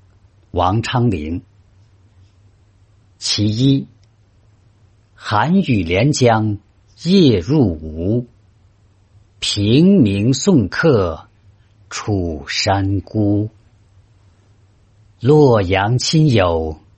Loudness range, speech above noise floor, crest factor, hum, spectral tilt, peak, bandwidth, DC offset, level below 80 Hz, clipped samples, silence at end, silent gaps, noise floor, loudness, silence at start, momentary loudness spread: 6 LU; 37 dB; 16 dB; none; -6 dB/octave; -2 dBFS; 8.8 kHz; under 0.1%; -44 dBFS; under 0.1%; 0.25 s; none; -52 dBFS; -16 LUFS; 0.55 s; 14 LU